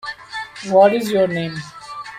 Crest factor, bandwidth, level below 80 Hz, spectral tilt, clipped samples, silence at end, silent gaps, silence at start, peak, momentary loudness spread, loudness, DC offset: 16 dB; 15.5 kHz; -58 dBFS; -5.5 dB/octave; under 0.1%; 0 s; none; 0.05 s; -2 dBFS; 18 LU; -17 LUFS; under 0.1%